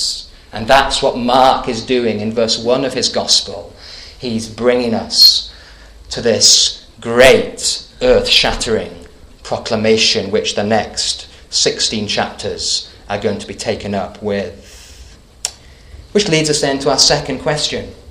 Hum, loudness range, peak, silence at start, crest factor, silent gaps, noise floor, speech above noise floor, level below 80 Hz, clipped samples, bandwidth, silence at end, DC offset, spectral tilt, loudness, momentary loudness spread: none; 9 LU; 0 dBFS; 0 s; 16 dB; none; -39 dBFS; 25 dB; -36 dBFS; 0.1%; over 20 kHz; 0 s; under 0.1%; -2.5 dB/octave; -13 LUFS; 16 LU